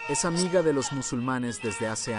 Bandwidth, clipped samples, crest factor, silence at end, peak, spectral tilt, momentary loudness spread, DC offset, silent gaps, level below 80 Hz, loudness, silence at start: 11 kHz; under 0.1%; 16 dB; 0 s; -12 dBFS; -4 dB/octave; 6 LU; under 0.1%; none; -54 dBFS; -27 LUFS; 0 s